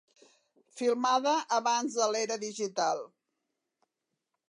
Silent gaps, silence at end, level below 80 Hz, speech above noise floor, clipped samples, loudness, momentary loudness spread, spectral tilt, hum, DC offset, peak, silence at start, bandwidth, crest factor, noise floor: none; 1.45 s; -90 dBFS; 56 dB; under 0.1%; -30 LUFS; 7 LU; -2 dB/octave; none; under 0.1%; -14 dBFS; 0.75 s; 11 kHz; 18 dB; -85 dBFS